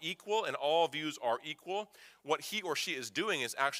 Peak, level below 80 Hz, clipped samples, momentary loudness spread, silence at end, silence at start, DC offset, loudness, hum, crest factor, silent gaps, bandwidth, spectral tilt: -16 dBFS; -88 dBFS; under 0.1%; 9 LU; 0 s; 0 s; under 0.1%; -35 LUFS; none; 20 dB; none; 16 kHz; -2.5 dB/octave